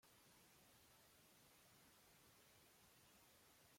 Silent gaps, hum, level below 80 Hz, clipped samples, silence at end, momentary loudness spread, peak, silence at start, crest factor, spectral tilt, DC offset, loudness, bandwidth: none; none; -90 dBFS; under 0.1%; 0 s; 0 LU; -56 dBFS; 0 s; 16 dB; -2.5 dB/octave; under 0.1%; -70 LUFS; 16.5 kHz